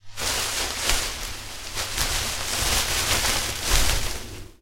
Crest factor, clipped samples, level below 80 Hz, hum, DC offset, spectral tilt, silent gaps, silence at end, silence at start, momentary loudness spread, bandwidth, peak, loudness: 24 dB; under 0.1%; -32 dBFS; none; under 0.1%; -1 dB/octave; none; 0.1 s; 0.05 s; 11 LU; 16 kHz; 0 dBFS; -24 LUFS